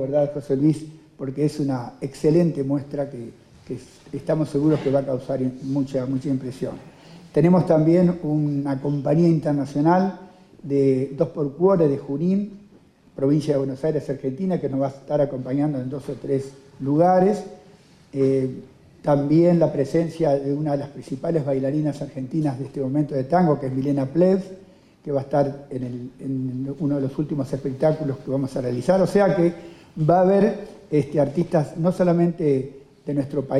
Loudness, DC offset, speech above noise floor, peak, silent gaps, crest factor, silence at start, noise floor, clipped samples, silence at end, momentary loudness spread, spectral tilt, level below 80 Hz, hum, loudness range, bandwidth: -22 LUFS; under 0.1%; 31 dB; -6 dBFS; none; 16 dB; 0 s; -52 dBFS; under 0.1%; 0 s; 14 LU; -9 dB/octave; -54 dBFS; none; 4 LU; 10.5 kHz